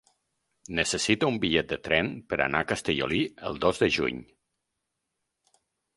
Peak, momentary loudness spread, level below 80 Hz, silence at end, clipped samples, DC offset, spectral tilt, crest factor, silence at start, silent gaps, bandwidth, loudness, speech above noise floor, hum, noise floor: -6 dBFS; 6 LU; -52 dBFS; 1.75 s; under 0.1%; under 0.1%; -4 dB/octave; 24 dB; 0.7 s; none; 11.5 kHz; -27 LUFS; 55 dB; none; -82 dBFS